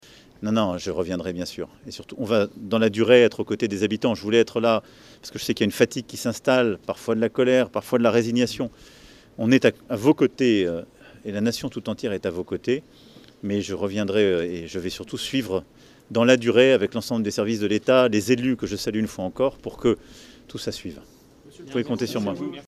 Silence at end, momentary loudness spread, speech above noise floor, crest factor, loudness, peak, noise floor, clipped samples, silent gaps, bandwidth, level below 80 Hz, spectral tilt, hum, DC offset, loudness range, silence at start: 0.05 s; 13 LU; 26 dB; 20 dB; -23 LUFS; -2 dBFS; -48 dBFS; under 0.1%; none; 15 kHz; -58 dBFS; -5.5 dB/octave; none; under 0.1%; 6 LU; 0.4 s